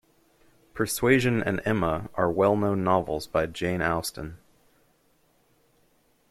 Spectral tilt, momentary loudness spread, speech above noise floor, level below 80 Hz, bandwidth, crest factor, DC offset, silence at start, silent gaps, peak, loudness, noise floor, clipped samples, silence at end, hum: -5.5 dB/octave; 10 LU; 40 dB; -52 dBFS; 16 kHz; 20 dB; under 0.1%; 0.75 s; none; -6 dBFS; -25 LUFS; -65 dBFS; under 0.1%; 1.95 s; none